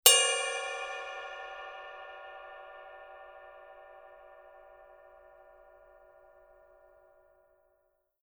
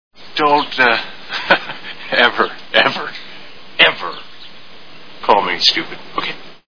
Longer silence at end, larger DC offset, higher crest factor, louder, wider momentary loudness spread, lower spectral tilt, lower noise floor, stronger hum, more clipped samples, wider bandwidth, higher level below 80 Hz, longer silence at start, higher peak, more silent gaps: first, 3.85 s vs 0 s; second, under 0.1% vs 2%; first, 34 dB vs 18 dB; second, -30 LUFS vs -15 LUFS; first, 25 LU vs 17 LU; second, 4 dB/octave vs -2.5 dB/octave; first, -75 dBFS vs -41 dBFS; neither; neither; first, over 20 kHz vs 5.4 kHz; second, -74 dBFS vs -54 dBFS; about the same, 0.05 s vs 0.1 s; about the same, -2 dBFS vs 0 dBFS; neither